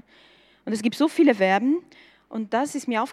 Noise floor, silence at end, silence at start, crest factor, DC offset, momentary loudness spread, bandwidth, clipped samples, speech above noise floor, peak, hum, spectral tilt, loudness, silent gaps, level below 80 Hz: -56 dBFS; 0 s; 0.65 s; 18 dB; under 0.1%; 14 LU; 13.5 kHz; under 0.1%; 33 dB; -4 dBFS; none; -5 dB/octave; -23 LUFS; none; -74 dBFS